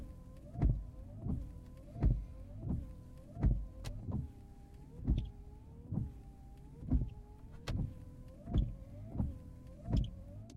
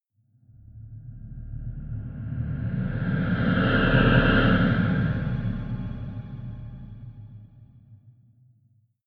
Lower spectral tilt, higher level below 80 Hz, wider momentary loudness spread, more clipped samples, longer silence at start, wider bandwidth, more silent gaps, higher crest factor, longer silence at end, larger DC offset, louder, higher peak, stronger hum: about the same, -8.5 dB/octave vs -9.5 dB/octave; second, -42 dBFS vs -36 dBFS; second, 18 LU vs 24 LU; neither; second, 0 s vs 0.65 s; first, 8.2 kHz vs 5.2 kHz; neither; about the same, 20 dB vs 22 dB; second, 0 s vs 0.95 s; neither; second, -41 LUFS vs -24 LUFS; second, -20 dBFS vs -4 dBFS; neither